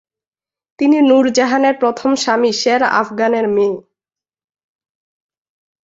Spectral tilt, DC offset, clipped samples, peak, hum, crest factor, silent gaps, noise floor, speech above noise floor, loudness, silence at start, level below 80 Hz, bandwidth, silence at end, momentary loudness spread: -3.5 dB/octave; under 0.1%; under 0.1%; -2 dBFS; none; 14 dB; none; -90 dBFS; 76 dB; -14 LUFS; 0.8 s; -62 dBFS; 8 kHz; 2.05 s; 6 LU